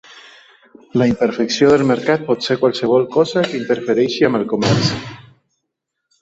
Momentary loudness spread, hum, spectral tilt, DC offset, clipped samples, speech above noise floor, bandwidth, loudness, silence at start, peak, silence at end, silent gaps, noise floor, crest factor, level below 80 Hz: 6 LU; none; -5.5 dB/octave; under 0.1%; under 0.1%; 61 dB; 8 kHz; -16 LUFS; 0.1 s; 0 dBFS; 1 s; none; -77 dBFS; 16 dB; -52 dBFS